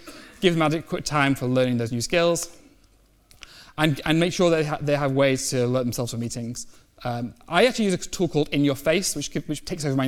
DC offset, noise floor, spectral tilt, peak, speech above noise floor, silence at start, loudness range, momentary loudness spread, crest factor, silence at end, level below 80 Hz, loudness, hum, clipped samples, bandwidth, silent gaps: under 0.1%; -58 dBFS; -5 dB/octave; -4 dBFS; 35 dB; 0 s; 2 LU; 11 LU; 20 dB; 0 s; -50 dBFS; -23 LUFS; none; under 0.1%; 17.5 kHz; none